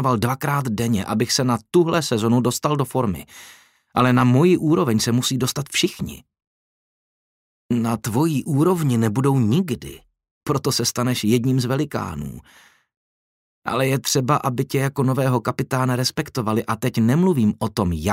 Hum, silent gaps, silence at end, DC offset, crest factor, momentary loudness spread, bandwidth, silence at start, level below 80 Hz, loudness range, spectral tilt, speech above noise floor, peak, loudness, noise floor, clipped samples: none; 6.47-7.69 s, 10.31-10.41 s, 12.97-13.62 s; 0 s; under 0.1%; 16 dB; 8 LU; 16 kHz; 0 s; -50 dBFS; 4 LU; -5.5 dB/octave; over 70 dB; -4 dBFS; -20 LUFS; under -90 dBFS; under 0.1%